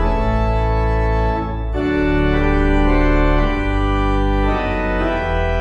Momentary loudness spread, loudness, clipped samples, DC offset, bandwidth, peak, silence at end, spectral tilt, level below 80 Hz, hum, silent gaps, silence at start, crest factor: 4 LU; -18 LUFS; under 0.1%; under 0.1%; 7 kHz; -2 dBFS; 0 s; -8 dB/octave; -20 dBFS; none; none; 0 s; 14 dB